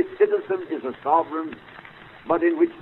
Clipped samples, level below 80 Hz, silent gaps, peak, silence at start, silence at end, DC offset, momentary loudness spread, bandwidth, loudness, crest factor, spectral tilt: under 0.1%; -62 dBFS; none; -6 dBFS; 0 s; 0 s; under 0.1%; 21 LU; 4.2 kHz; -23 LUFS; 18 dB; -8.5 dB/octave